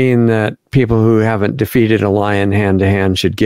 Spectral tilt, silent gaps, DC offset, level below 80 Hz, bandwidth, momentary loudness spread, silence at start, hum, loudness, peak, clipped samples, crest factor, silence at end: -7 dB/octave; none; 0.6%; -40 dBFS; 16 kHz; 4 LU; 0 s; none; -13 LUFS; 0 dBFS; under 0.1%; 12 dB; 0 s